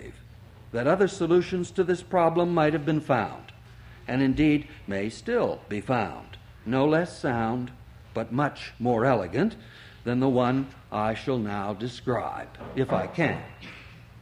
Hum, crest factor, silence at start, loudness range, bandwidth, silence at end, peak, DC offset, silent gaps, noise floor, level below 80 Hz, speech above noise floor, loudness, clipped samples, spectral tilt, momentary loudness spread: none; 18 dB; 0 s; 4 LU; 11.5 kHz; 0 s; -8 dBFS; under 0.1%; none; -48 dBFS; -52 dBFS; 22 dB; -27 LUFS; under 0.1%; -7 dB/octave; 15 LU